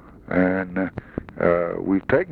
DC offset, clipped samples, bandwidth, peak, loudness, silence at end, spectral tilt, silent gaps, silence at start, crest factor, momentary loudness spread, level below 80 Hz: under 0.1%; under 0.1%; 4.6 kHz; -6 dBFS; -23 LUFS; 0 s; -10 dB/octave; none; 0.05 s; 18 dB; 9 LU; -48 dBFS